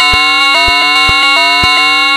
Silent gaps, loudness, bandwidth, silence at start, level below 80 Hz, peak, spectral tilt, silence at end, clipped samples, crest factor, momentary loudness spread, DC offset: none; -6 LUFS; 17 kHz; 0 s; -30 dBFS; 0 dBFS; -1.5 dB/octave; 0 s; 0.7%; 8 dB; 0 LU; under 0.1%